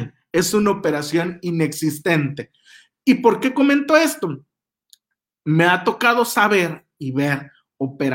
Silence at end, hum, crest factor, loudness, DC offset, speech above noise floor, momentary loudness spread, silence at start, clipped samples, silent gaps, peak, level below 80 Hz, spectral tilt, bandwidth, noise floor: 0 s; none; 18 dB; -19 LUFS; under 0.1%; 58 dB; 12 LU; 0 s; under 0.1%; none; -2 dBFS; -60 dBFS; -5 dB/octave; 18.5 kHz; -76 dBFS